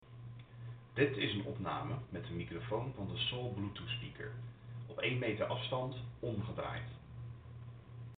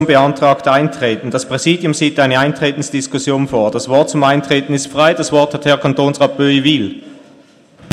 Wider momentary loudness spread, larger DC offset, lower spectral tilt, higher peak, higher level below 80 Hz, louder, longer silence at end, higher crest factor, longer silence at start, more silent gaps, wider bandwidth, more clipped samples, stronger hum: first, 16 LU vs 7 LU; neither; about the same, -4 dB/octave vs -5 dB/octave; second, -16 dBFS vs 0 dBFS; second, -62 dBFS vs -54 dBFS; second, -40 LUFS vs -13 LUFS; about the same, 0 s vs 0 s; first, 24 dB vs 14 dB; about the same, 0 s vs 0 s; neither; second, 4.6 kHz vs 12.5 kHz; neither; neither